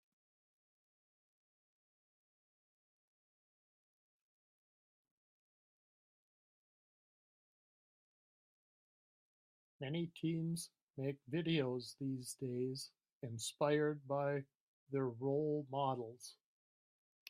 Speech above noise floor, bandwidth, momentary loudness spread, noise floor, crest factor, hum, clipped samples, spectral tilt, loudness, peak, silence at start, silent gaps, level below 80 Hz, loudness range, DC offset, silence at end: over 50 dB; 14.5 kHz; 13 LU; under -90 dBFS; 22 dB; none; under 0.1%; -5.5 dB/octave; -41 LUFS; -22 dBFS; 9.8 s; 10.82-10.94 s, 13.12-13.21 s, 14.55-14.87 s; -86 dBFS; 7 LU; under 0.1%; 0.95 s